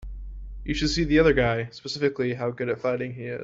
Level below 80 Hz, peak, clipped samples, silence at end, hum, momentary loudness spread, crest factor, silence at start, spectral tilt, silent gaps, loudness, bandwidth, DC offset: -38 dBFS; -8 dBFS; under 0.1%; 0 s; none; 18 LU; 18 dB; 0 s; -5.5 dB/octave; none; -25 LUFS; 7.8 kHz; under 0.1%